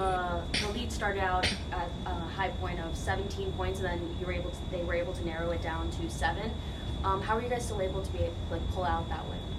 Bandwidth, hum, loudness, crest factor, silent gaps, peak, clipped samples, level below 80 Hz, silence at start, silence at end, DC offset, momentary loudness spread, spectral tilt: 13.5 kHz; none; -33 LUFS; 18 dB; none; -16 dBFS; under 0.1%; -40 dBFS; 0 s; 0 s; under 0.1%; 6 LU; -5 dB/octave